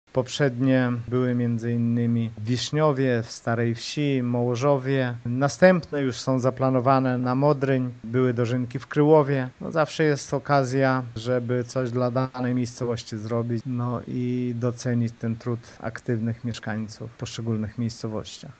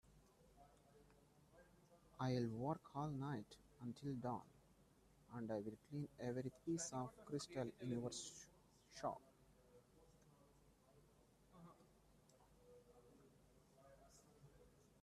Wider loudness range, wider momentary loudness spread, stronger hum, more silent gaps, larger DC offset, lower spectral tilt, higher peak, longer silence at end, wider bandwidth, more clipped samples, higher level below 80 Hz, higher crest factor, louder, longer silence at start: second, 6 LU vs 10 LU; second, 10 LU vs 23 LU; neither; neither; neither; about the same, -6.5 dB/octave vs -5.5 dB/octave; first, -4 dBFS vs -30 dBFS; second, 0.1 s vs 0.35 s; second, 8.6 kHz vs 13.5 kHz; neither; first, -60 dBFS vs -78 dBFS; about the same, 20 dB vs 22 dB; first, -25 LUFS vs -49 LUFS; about the same, 0.15 s vs 0.1 s